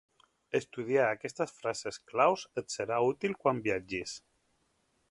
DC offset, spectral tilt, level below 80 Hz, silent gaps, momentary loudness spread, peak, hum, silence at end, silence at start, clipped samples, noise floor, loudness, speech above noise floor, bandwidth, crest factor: under 0.1%; -4.5 dB/octave; -68 dBFS; none; 10 LU; -12 dBFS; none; 0.95 s; 0.55 s; under 0.1%; -75 dBFS; -32 LUFS; 43 dB; 11.5 kHz; 20 dB